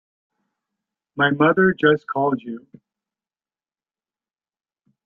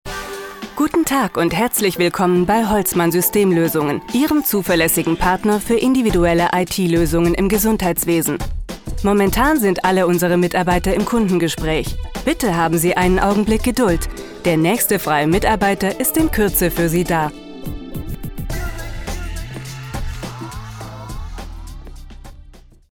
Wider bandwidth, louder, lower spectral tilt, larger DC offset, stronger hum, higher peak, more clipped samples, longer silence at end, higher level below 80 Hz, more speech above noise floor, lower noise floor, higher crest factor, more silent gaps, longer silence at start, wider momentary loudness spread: second, 4.3 kHz vs 17.5 kHz; about the same, -19 LUFS vs -17 LUFS; first, -9 dB/octave vs -5 dB/octave; neither; neither; about the same, -2 dBFS vs -2 dBFS; neither; first, 2.45 s vs 0.35 s; second, -64 dBFS vs -30 dBFS; first, over 71 dB vs 26 dB; first, under -90 dBFS vs -42 dBFS; first, 22 dB vs 16 dB; neither; first, 1.15 s vs 0.05 s; first, 20 LU vs 15 LU